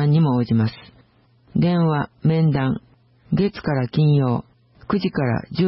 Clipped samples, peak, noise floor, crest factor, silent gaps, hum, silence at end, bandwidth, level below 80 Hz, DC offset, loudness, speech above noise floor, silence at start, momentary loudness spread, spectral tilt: under 0.1%; -8 dBFS; -56 dBFS; 12 dB; none; none; 0 s; 5.8 kHz; -50 dBFS; under 0.1%; -21 LUFS; 37 dB; 0 s; 8 LU; -12.5 dB/octave